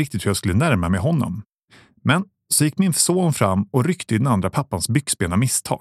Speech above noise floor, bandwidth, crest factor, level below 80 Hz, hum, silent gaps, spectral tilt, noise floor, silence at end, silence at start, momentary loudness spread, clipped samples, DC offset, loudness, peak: 33 dB; 15.5 kHz; 18 dB; -50 dBFS; none; 1.54-1.59 s; -5 dB/octave; -53 dBFS; 0.05 s; 0 s; 6 LU; under 0.1%; under 0.1%; -20 LUFS; -2 dBFS